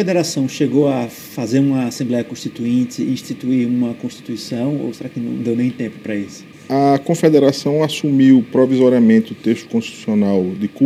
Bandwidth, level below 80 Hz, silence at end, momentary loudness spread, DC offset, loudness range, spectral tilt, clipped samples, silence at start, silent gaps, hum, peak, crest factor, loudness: 15.5 kHz; -64 dBFS; 0 s; 13 LU; under 0.1%; 7 LU; -6.5 dB/octave; under 0.1%; 0 s; none; none; 0 dBFS; 16 dB; -17 LUFS